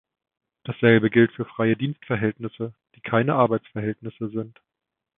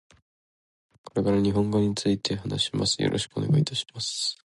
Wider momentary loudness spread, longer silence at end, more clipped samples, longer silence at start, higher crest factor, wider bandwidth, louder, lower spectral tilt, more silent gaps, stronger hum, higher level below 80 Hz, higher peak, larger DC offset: first, 17 LU vs 5 LU; first, 0.7 s vs 0.25 s; neither; second, 0.65 s vs 1.15 s; first, 22 dB vs 16 dB; second, 3.9 kHz vs 11.5 kHz; first, -23 LUFS vs -26 LUFS; first, -11.5 dB/octave vs -5 dB/octave; neither; neither; second, -62 dBFS vs -52 dBFS; first, -2 dBFS vs -12 dBFS; neither